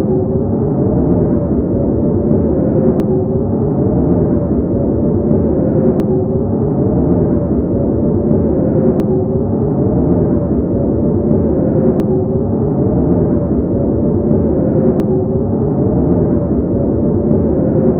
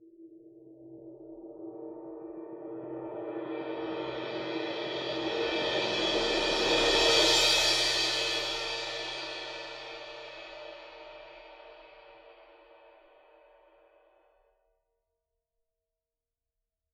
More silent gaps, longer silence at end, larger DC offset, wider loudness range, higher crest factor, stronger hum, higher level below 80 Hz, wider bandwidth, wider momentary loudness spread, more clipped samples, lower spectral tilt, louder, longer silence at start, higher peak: neither; second, 0 s vs 4.05 s; neither; second, 0 LU vs 20 LU; second, 12 dB vs 22 dB; neither; first, -26 dBFS vs -56 dBFS; second, 2.9 kHz vs 18 kHz; second, 2 LU vs 25 LU; neither; first, -13 dB/octave vs -1.5 dB/octave; first, -14 LUFS vs -28 LUFS; about the same, 0 s vs 0 s; first, 0 dBFS vs -10 dBFS